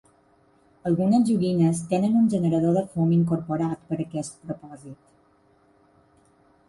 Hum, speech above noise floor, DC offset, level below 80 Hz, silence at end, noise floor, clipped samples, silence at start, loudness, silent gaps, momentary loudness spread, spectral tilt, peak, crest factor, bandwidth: none; 38 dB; under 0.1%; -60 dBFS; 1.75 s; -61 dBFS; under 0.1%; 0.85 s; -23 LUFS; none; 16 LU; -8 dB/octave; -10 dBFS; 14 dB; 11.5 kHz